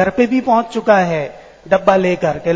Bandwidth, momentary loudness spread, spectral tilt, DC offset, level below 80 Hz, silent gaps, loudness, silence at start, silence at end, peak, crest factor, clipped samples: 8 kHz; 6 LU; -6.5 dB/octave; under 0.1%; -48 dBFS; none; -15 LUFS; 0 s; 0 s; 0 dBFS; 14 dB; under 0.1%